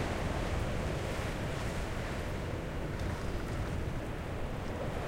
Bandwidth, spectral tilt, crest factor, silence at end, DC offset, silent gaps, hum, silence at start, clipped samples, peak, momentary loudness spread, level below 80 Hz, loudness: 16 kHz; -6 dB/octave; 14 dB; 0 s; under 0.1%; none; none; 0 s; under 0.1%; -22 dBFS; 4 LU; -40 dBFS; -37 LUFS